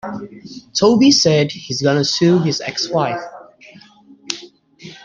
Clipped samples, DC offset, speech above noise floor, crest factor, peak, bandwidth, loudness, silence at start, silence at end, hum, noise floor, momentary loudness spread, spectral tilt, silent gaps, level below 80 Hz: under 0.1%; under 0.1%; 30 dB; 16 dB; -2 dBFS; 9.8 kHz; -16 LUFS; 0.05 s; 0.1 s; none; -45 dBFS; 19 LU; -4.5 dB/octave; none; -56 dBFS